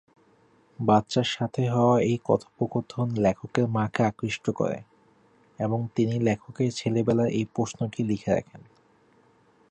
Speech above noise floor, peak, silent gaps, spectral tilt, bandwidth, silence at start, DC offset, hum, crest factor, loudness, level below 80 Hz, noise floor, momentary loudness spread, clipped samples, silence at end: 36 dB; -8 dBFS; none; -6.5 dB/octave; 9.4 kHz; 0.8 s; under 0.1%; none; 20 dB; -26 LUFS; -58 dBFS; -61 dBFS; 7 LU; under 0.1%; 1.1 s